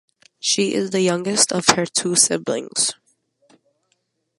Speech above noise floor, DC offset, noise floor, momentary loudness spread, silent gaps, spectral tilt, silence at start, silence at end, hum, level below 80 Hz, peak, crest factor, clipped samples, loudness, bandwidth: 51 dB; under 0.1%; -70 dBFS; 7 LU; none; -2.5 dB/octave; 0.45 s; 1.45 s; none; -64 dBFS; 0 dBFS; 22 dB; under 0.1%; -18 LUFS; 16 kHz